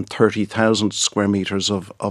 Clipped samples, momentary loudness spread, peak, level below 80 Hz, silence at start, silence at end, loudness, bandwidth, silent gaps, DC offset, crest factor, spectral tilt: under 0.1%; 4 LU; 0 dBFS; -60 dBFS; 0 s; 0 s; -19 LUFS; 12 kHz; none; under 0.1%; 18 dB; -4 dB/octave